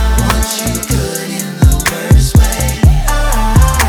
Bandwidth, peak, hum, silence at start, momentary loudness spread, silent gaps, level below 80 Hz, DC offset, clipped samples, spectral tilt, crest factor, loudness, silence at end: 19.5 kHz; 0 dBFS; none; 0 s; 5 LU; none; -12 dBFS; under 0.1%; 0.4%; -4.5 dB/octave; 10 dB; -12 LUFS; 0 s